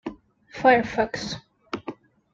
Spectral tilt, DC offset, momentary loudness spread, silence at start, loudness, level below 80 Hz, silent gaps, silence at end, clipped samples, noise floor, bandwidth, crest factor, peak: -4.5 dB/octave; under 0.1%; 20 LU; 0.05 s; -23 LUFS; -56 dBFS; none; 0.4 s; under 0.1%; -45 dBFS; 7.8 kHz; 22 dB; -4 dBFS